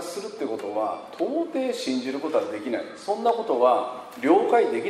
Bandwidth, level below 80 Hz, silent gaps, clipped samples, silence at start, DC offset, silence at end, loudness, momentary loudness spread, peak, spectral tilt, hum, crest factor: 14 kHz; -76 dBFS; none; under 0.1%; 0 s; under 0.1%; 0 s; -25 LUFS; 10 LU; -6 dBFS; -4.5 dB/octave; none; 18 dB